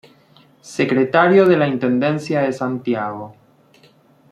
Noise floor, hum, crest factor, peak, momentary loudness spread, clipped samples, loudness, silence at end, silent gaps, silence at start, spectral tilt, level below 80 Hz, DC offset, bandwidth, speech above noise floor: -52 dBFS; none; 16 dB; -2 dBFS; 15 LU; under 0.1%; -17 LUFS; 1 s; none; 0.65 s; -7 dB/octave; -64 dBFS; under 0.1%; 11 kHz; 35 dB